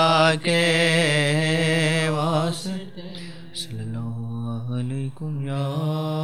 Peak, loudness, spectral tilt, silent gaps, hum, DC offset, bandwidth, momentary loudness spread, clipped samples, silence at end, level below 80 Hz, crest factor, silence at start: -6 dBFS; -22 LUFS; -5 dB/octave; none; none; 0.9%; 14 kHz; 15 LU; under 0.1%; 0 s; -64 dBFS; 16 dB; 0 s